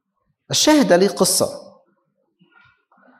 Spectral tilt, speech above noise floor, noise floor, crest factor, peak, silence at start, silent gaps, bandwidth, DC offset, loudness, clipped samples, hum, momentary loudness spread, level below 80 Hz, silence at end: -3 dB/octave; 52 dB; -68 dBFS; 18 dB; -2 dBFS; 0.5 s; none; 16 kHz; under 0.1%; -16 LUFS; under 0.1%; none; 10 LU; -58 dBFS; 1.6 s